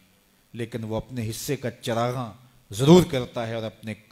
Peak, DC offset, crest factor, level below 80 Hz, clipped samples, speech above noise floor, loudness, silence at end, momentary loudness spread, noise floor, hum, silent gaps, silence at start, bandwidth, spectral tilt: -2 dBFS; under 0.1%; 22 dB; -52 dBFS; under 0.1%; 37 dB; -24 LUFS; 0.15 s; 20 LU; -61 dBFS; none; none; 0.55 s; 16 kHz; -6 dB/octave